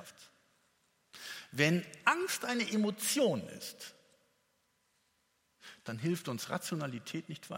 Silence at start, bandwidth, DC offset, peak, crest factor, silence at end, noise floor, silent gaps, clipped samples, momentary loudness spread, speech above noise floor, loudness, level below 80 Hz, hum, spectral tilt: 0 s; 16.5 kHz; under 0.1%; -12 dBFS; 24 dB; 0 s; -77 dBFS; none; under 0.1%; 19 LU; 42 dB; -34 LUFS; -82 dBFS; none; -4 dB/octave